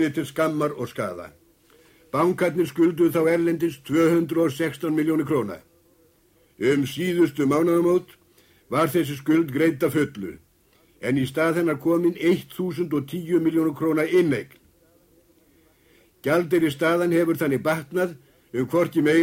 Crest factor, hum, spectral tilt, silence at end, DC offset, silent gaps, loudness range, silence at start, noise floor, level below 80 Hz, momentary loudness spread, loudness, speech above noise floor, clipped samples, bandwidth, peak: 16 dB; none; -6.5 dB/octave; 0 s; under 0.1%; none; 3 LU; 0 s; -60 dBFS; -62 dBFS; 9 LU; -23 LUFS; 38 dB; under 0.1%; 16.5 kHz; -8 dBFS